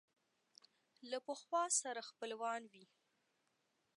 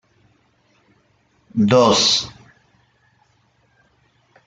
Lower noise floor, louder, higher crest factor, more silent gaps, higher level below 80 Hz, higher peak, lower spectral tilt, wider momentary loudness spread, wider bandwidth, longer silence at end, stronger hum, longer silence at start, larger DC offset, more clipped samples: first, -83 dBFS vs -61 dBFS; second, -42 LUFS vs -15 LUFS; about the same, 20 dB vs 20 dB; neither; second, under -90 dBFS vs -56 dBFS; second, -26 dBFS vs -2 dBFS; second, 0 dB/octave vs -4 dB/octave; about the same, 13 LU vs 15 LU; first, 11.5 kHz vs 9.4 kHz; second, 1.15 s vs 2.15 s; neither; second, 1 s vs 1.55 s; neither; neither